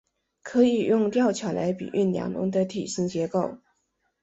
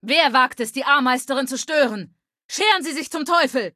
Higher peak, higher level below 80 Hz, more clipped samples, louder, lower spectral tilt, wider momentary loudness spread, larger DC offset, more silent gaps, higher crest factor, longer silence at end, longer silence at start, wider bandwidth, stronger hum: second, -8 dBFS vs -2 dBFS; first, -64 dBFS vs -72 dBFS; neither; second, -25 LUFS vs -19 LUFS; first, -6 dB/octave vs -2 dB/octave; about the same, 7 LU vs 9 LU; neither; second, none vs 2.44-2.49 s; about the same, 18 dB vs 18 dB; first, 0.65 s vs 0.05 s; first, 0.45 s vs 0.05 s; second, 8.2 kHz vs 15 kHz; neither